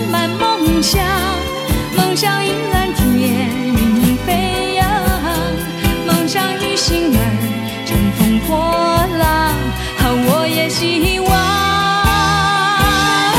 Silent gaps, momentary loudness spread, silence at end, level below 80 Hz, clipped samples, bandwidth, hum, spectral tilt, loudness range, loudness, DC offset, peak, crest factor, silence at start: none; 5 LU; 0 s; -26 dBFS; under 0.1%; 17 kHz; none; -4.5 dB/octave; 2 LU; -15 LUFS; under 0.1%; 0 dBFS; 14 dB; 0 s